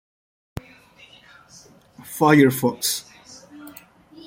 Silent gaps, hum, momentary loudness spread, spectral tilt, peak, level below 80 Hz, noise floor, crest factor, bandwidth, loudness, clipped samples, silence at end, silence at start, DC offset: none; none; 27 LU; -4.5 dB/octave; -2 dBFS; -58 dBFS; -50 dBFS; 22 dB; 16.5 kHz; -19 LUFS; under 0.1%; 0.55 s; 2.05 s; under 0.1%